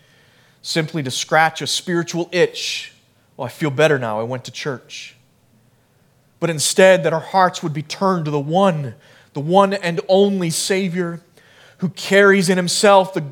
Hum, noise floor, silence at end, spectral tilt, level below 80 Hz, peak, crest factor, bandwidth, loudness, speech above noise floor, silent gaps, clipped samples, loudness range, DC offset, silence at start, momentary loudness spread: none; -57 dBFS; 0 s; -4 dB/octave; -70 dBFS; 0 dBFS; 18 dB; 18 kHz; -17 LUFS; 40 dB; none; under 0.1%; 6 LU; under 0.1%; 0.65 s; 16 LU